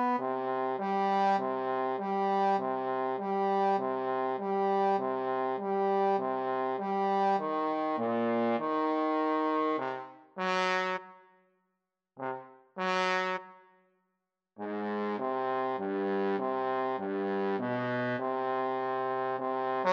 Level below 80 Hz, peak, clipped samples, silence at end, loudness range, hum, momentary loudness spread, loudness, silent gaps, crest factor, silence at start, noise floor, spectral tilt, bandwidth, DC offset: under -90 dBFS; -14 dBFS; under 0.1%; 0 s; 5 LU; none; 6 LU; -31 LUFS; none; 18 dB; 0 s; -84 dBFS; -6 dB/octave; 8 kHz; under 0.1%